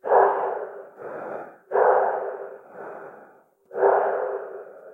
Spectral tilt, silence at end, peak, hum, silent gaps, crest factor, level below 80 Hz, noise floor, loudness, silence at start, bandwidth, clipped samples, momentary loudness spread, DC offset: -7.5 dB/octave; 0 s; -4 dBFS; none; none; 20 dB; -86 dBFS; -53 dBFS; -23 LUFS; 0.05 s; 3.4 kHz; under 0.1%; 20 LU; under 0.1%